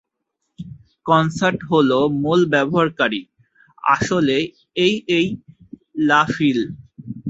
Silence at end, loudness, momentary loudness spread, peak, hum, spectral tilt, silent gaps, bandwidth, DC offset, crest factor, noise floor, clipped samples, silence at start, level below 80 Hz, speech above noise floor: 0 s; -18 LUFS; 18 LU; -2 dBFS; none; -5.5 dB/octave; none; 8 kHz; under 0.1%; 18 dB; -76 dBFS; under 0.1%; 0.6 s; -54 dBFS; 58 dB